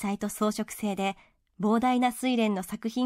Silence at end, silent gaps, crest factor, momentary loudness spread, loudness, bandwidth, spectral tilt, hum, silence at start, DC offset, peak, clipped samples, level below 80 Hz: 0 s; none; 14 dB; 8 LU; -28 LUFS; 16 kHz; -5 dB/octave; none; 0 s; under 0.1%; -14 dBFS; under 0.1%; -62 dBFS